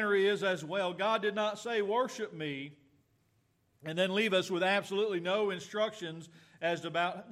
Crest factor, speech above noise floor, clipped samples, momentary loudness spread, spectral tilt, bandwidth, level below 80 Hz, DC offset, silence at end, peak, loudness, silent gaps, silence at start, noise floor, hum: 16 dB; 41 dB; under 0.1%; 10 LU; -4.5 dB/octave; 14 kHz; -84 dBFS; under 0.1%; 0 s; -16 dBFS; -32 LUFS; none; 0 s; -73 dBFS; none